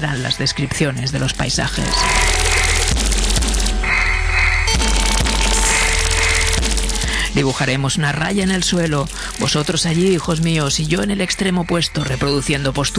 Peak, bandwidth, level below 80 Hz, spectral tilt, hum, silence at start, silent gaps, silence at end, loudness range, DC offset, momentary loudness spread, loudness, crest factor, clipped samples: -2 dBFS; 11 kHz; -22 dBFS; -3.5 dB/octave; none; 0 s; none; 0 s; 2 LU; under 0.1%; 4 LU; -16 LUFS; 14 dB; under 0.1%